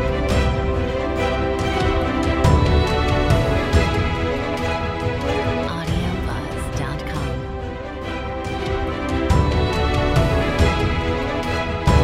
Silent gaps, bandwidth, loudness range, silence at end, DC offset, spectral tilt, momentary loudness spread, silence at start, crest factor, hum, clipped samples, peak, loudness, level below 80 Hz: none; 13.5 kHz; 6 LU; 0 s; under 0.1%; -6.5 dB/octave; 8 LU; 0 s; 18 dB; none; under 0.1%; -2 dBFS; -21 LUFS; -26 dBFS